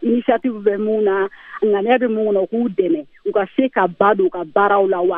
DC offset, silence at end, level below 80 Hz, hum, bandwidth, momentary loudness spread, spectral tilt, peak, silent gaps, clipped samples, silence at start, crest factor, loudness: under 0.1%; 0 s; -62 dBFS; none; 3.8 kHz; 6 LU; -9.5 dB/octave; 0 dBFS; none; under 0.1%; 0 s; 16 dB; -18 LUFS